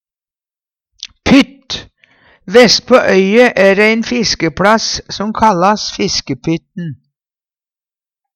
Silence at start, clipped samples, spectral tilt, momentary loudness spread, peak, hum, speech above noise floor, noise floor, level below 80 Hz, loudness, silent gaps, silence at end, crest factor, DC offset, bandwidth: 1.05 s; 0.1%; -4 dB/octave; 16 LU; 0 dBFS; none; over 79 dB; under -90 dBFS; -42 dBFS; -11 LUFS; none; 1.4 s; 14 dB; under 0.1%; 15 kHz